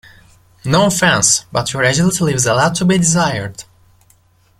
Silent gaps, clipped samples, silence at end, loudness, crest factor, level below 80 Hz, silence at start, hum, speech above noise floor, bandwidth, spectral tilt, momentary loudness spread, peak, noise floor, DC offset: none; under 0.1%; 1 s; -14 LUFS; 16 dB; -44 dBFS; 0.65 s; none; 39 dB; 15.5 kHz; -3.5 dB/octave; 11 LU; 0 dBFS; -53 dBFS; under 0.1%